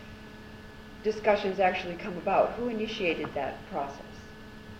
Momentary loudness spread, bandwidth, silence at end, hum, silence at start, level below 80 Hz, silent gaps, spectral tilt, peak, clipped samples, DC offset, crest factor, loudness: 20 LU; 15.5 kHz; 0 s; none; 0 s; -54 dBFS; none; -5.5 dB/octave; -12 dBFS; under 0.1%; under 0.1%; 20 dB; -30 LUFS